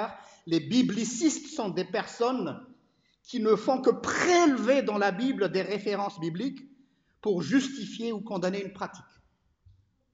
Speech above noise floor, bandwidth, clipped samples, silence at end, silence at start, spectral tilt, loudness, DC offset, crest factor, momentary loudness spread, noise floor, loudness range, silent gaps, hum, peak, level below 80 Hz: 40 dB; 9 kHz; under 0.1%; 1.1 s; 0 s; -4.5 dB/octave; -28 LUFS; under 0.1%; 18 dB; 13 LU; -68 dBFS; 6 LU; none; none; -10 dBFS; -70 dBFS